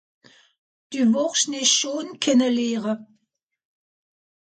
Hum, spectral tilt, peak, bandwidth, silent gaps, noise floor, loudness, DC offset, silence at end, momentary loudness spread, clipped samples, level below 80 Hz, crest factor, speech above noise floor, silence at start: none; -2 dB/octave; -6 dBFS; 9.4 kHz; none; -76 dBFS; -21 LUFS; under 0.1%; 1.5 s; 10 LU; under 0.1%; -74 dBFS; 20 dB; 55 dB; 0.9 s